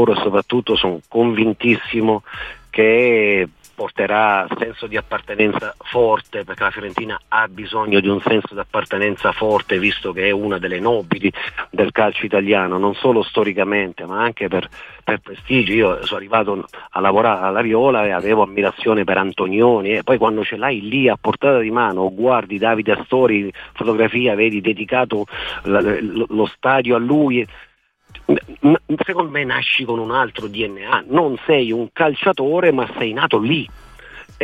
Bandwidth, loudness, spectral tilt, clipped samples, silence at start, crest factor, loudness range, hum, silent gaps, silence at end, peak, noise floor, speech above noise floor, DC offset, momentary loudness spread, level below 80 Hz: 8.8 kHz; -17 LUFS; -7 dB/octave; under 0.1%; 0 s; 16 dB; 2 LU; none; none; 0 s; -2 dBFS; -52 dBFS; 35 dB; under 0.1%; 8 LU; -50 dBFS